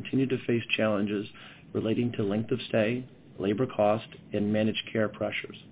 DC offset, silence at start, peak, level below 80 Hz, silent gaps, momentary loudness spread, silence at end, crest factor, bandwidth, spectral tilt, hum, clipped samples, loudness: under 0.1%; 0 s; -10 dBFS; -62 dBFS; none; 9 LU; 0 s; 18 dB; 4 kHz; -5 dB/octave; none; under 0.1%; -29 LUFS